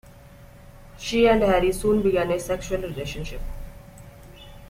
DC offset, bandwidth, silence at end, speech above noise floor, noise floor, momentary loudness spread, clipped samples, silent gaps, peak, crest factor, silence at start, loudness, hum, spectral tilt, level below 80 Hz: under 0.1%; 16.5 kHz; 0.05 s; 24 dB; -47 dBFS; 20 LU; under 0.1%; none; -6 dBFS; 18 dB; 0.15 s; -23 LUFS; none; -5.5 dB/octave; -38 dBFS